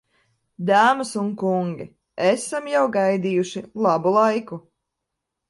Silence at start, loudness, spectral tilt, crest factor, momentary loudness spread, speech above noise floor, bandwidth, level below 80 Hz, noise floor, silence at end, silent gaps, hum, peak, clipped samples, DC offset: 0.6 s; -21 LUFS; -5.5 dB/octave; 18 dB; 12 LU; 61 dB; 11.5 kHz; -68 dBFS; -81 dBFS; 0.9 s; none; none; -4 dBFS; under 0.1%; under 0.1%